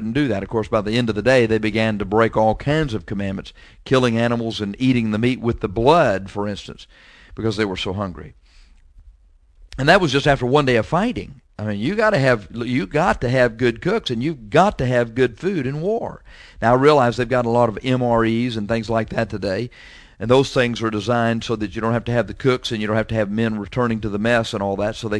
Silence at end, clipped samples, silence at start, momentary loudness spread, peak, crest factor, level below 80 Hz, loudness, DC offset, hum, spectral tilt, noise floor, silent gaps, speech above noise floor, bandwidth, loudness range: 0 s; under 0.1%; 0 s; 10 LU; 0 dBFS; 20 dB; -42 dBFS; -19 LUFS; under 0.1%; none; -6.5 dB/octave; -51 dBFS; none; 32 dB; 11 kHz; 3 LU